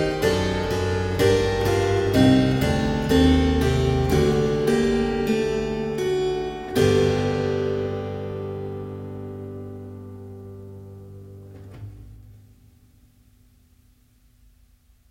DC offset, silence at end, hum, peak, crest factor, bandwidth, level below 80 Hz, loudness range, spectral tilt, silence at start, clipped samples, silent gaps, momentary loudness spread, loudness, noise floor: under 0.1%; 2.8 s; none; -4 dBFS; 18 dB; 16.5 kHz; -36 dBFS; 20 LU; -6.5 dB/octave; 0 s; under 0.1%; none; 22 LU; -22 LUFS; -58 dBFS